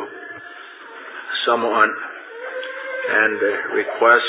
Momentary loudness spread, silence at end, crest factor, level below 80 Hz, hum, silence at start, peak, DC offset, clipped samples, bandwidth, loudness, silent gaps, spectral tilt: 19 LU; 0 s; 20 dB; -80 dBFS; none; 0 s; 0 dBFS; under 0.1%; under 0.1%; 4 kHz; -19 LUFS; none; -6 dB/octave